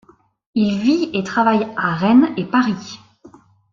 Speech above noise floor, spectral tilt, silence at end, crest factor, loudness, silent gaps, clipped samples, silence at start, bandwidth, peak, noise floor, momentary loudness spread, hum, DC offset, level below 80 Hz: 30 dB; -6.5 dB/octave; 0.75 s; 16 dB; -17 LUFS; none; under 0.1%; 0.55 s; 7.4 kHz; -2 dBFS; -47 dBFS; 12 LU; none; under 0.1%; -58 dBFS